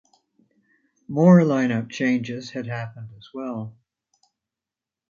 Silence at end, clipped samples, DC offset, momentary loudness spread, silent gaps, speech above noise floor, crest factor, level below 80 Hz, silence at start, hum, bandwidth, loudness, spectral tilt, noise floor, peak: 1.4 s; under 0.1%; under 0.1%; 21 LU; none; 68 dB; 20 dB; -68 dBFS; 1.1 s; none; 7.2 kHz; -21 LUFS; -8 dB/octave; -89 dBFS; -4 dBFS